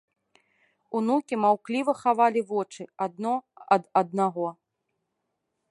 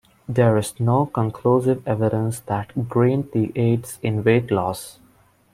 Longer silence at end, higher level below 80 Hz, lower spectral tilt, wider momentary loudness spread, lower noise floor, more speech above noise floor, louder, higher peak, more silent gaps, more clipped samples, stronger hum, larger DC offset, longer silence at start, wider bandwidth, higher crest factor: first, 1.2 s vs 0.6 s; second, -80 dBFS vs -54 dBFS; about the same, -6.5 dB/octave vs -7.5 dB/octave; first, 10 LU vs 7 LU; first, -80 dBFS vs -56 dBFS; first, 55 dB vs 36 dB; second, -26 LUFS vs -21 LUFS; about the same, -6 dBFS vs -4 dBFS; neither; neither; neither; neither; first, 0.9 s vs 0.3 s; second, 11.5 kHz vs 15.5 kHz; about the same, 20 dB vs 18 dB